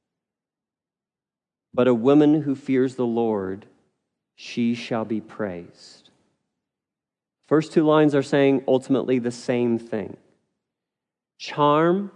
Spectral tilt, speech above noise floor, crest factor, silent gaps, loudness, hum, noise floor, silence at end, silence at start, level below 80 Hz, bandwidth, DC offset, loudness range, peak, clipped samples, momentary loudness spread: -7 dB/octave; over 69 dB; 18 dB; none; -22 LUFS; none; under -90 dBFS; 0.05 s; 1.75 s; -76 dBFS; 10 kHz; under 0.1%; 9 LU; -6 dBFS; under 0.1%; 15 LU